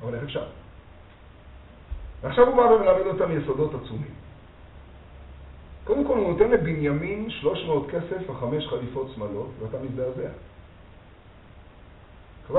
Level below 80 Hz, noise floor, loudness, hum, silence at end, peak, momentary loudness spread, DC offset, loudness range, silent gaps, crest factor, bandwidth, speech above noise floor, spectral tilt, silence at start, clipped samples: -46 dBFS; -49 dBFS; -25 LUFS; none; 0 s; -2 dBFS; 22 LU; under 0.1%; 10 LU; none; 24 dB; 4.1 kHz; 25 dB; -5.5 dB/octave; 0 s; under 0.1%